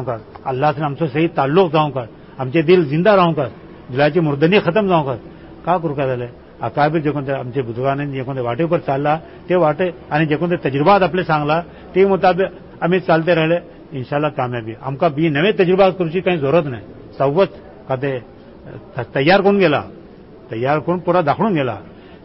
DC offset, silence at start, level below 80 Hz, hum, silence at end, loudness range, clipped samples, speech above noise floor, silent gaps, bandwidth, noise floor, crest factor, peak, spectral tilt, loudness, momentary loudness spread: 0.1%; 0 s; -48 dBFS; none; 0.05 s; 4 LU; under 0.1%; 23 dB; none; 5.8 kHz; -40 dBFS; 16 dB; -2 dBFS; -11.5 dB/octave; -17 LUFS; 13 LU